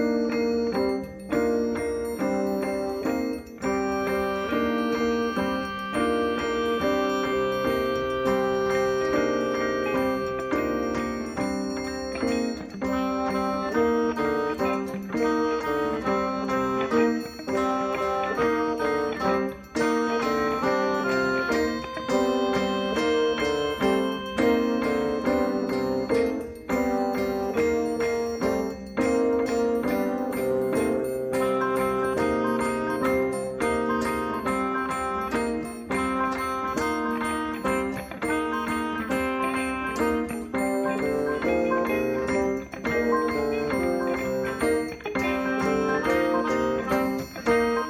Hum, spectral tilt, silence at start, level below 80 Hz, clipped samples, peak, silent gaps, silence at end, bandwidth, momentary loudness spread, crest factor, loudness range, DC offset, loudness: none; -5.5 dB/octave; 0 s; -50 dBFS; under 0.1%; -10 dBFS; none; 0 s; 16 kHz; 4 LU; 16 dB; 2 LU; under 0.1%; -26 LUFS